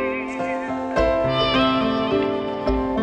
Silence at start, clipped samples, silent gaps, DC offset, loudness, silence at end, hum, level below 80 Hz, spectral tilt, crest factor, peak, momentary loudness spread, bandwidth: 0 s; under 0.1%; none; under 0.1%; -21 LUFS; 0 s; none; -36 dBFS; -6.5 dB/octave; 16 dB; -6 dBFS; 7 LU; 8.8 kHz